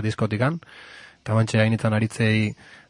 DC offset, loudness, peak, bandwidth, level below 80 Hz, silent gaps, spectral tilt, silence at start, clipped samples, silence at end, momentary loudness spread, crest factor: under 0.1%; -23 LUFS; -4 dBFS; 11.5 kHz; -56 dBFS; none; -6.5 dB/octave; 0 s; under 0.1%; 0.15 s; 20 LU; 20 dB